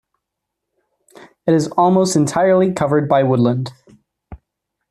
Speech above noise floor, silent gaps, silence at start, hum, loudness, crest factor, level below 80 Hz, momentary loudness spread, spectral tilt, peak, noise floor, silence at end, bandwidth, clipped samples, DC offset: 65 dB; none; 1.45 s; none; -16 LUFS; 14 dB; -52 dBFS; 7 LU; -6.5 dB/octave; -2 dBFS; -79 dBFS; 0.55 s; 13 kHz; under 0.1%; under 0.1%